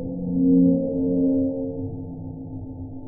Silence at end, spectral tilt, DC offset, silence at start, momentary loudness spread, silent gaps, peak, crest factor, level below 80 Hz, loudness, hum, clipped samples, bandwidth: 0 s; -18 dB/octave; under 0.1%; 0 s; 17 LU; none; -8 dBFS; 14 dB; -46 dBFS; -22 LUFS; none; under 0.1%; 0.9 kHz